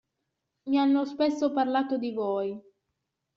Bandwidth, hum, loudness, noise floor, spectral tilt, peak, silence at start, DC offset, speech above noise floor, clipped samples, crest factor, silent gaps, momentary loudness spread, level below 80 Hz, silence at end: 7.2 kHz; none; -27 LUFS; -82 dBFS; -3.5 dB/octave; -12 dBFS; 0.65 s; under 0.1%; 56 dB; under 0.1%; 16 dB; none; 10 LU; -74 dBFS; 0.75 s